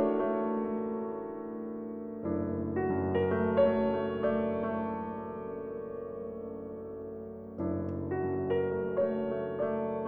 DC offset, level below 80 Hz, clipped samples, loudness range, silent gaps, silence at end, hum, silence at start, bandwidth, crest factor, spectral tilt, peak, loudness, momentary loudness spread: under 0.1%; -64 dBFS; under 0.1%; 8 LU; none; 0 s; none; 0 s; 4.3 kHz; 18 dB; -11 dB/octave; -14 dBFS; -33 LUFS; 12 LU